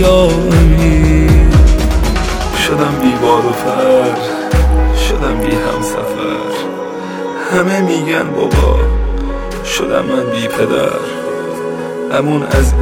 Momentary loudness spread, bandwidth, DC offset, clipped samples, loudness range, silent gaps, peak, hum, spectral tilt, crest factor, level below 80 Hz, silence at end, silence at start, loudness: 10 LU; 17 kHz; under 0.1%; under 0.1%; 5 LU; none; 0 dBFS; none; -6 dB/octave; 12 dB; -16 dBFS; 0 s; 0 s; -13 LUFS